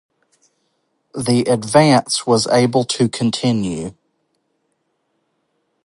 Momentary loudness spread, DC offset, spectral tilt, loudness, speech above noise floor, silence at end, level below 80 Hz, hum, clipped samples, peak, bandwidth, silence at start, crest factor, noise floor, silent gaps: 12 LU; under 0.1%; -5 dB/octave; -16 LUFS; 53 dB; 1.95 s; -56 dBFS; none; under 0.1%; 0 dBFS; 11.5 kHz; 1.15 s; 18 dB; -69 dBFS; none